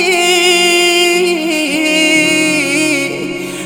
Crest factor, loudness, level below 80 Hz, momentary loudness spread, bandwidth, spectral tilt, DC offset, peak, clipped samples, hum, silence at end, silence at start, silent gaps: 12 dB; -10 LUFS; -56 dBFS; 7 LU; 19.5 kHz; -2 dB/octave; under 0.1%; 0 dBFS; under 0.1%; none; 0 s; 0 s; none